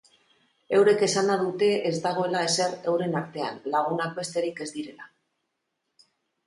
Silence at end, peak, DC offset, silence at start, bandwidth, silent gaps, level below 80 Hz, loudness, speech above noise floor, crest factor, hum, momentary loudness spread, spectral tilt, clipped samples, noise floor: 1.4 s; -10 dBFS; under 0.1%; 0.7 s; 11.5 kHz; none; -74 dBFS; -25 LUFS; 54 dB; 18 dB; none; 12 LU; -4 dB/octave; under 0.1%; -80 dBFS